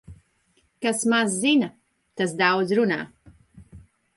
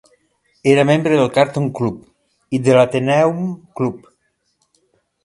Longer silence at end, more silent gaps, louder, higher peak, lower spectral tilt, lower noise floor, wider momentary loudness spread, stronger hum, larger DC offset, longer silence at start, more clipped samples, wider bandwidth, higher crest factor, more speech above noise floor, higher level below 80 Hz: second, 0.4 s vs 1.25 s; neither; second, -23 LUFS vs -16 LUFS; second, -8 dBFS vs 0 dBFS; second, -3.5 dB/octave vs -6.5 dB/octave; about the same, -66 dBFS vs -66 dBFS; about the same, 11 LU vs 11 LU; neither; neither; second, 0.1 s vs 0.65 s; neither; about the same, 11.5 kHz vs 11.5 kHz; about the same, 18 dB vs 18 dB; second, 44 dB vs 50 dB; about the same, -60 dBFS vs -56 dBFS